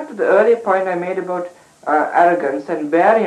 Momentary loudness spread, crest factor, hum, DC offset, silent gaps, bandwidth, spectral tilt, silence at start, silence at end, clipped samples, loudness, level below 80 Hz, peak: 11 LU; 14 dB; none; under 0.1%; none; 10.5 kHz; -6.5 dB/octave; 0 s; 0 s; under 0.1%; -16 LUFS; -72 dBFS; -2 dBFS